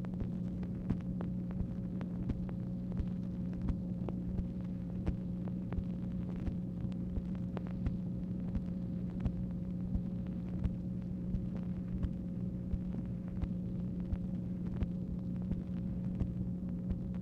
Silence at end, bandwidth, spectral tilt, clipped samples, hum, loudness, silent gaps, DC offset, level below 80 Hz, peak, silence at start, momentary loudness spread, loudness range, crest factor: 0 s; 5 kHz; -10.5 dB/octave; under 0.1%; none; -39 LUFS; none; under 0.1%; -46 dBFS; -20 dBFS; 0 s; 2 LU; 1 LU; 18 dB